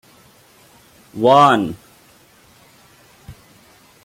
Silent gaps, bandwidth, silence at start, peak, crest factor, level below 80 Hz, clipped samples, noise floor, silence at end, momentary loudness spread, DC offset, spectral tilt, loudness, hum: none; 16.5 kHz; 1.15 s; 0 dBFS; 20 dB; -56 dBFS; under 0.1%; -50 dBFS; 0.75 s; 26 LU; under 0.1%; -5.5 dB/octave; -14 LUFS; none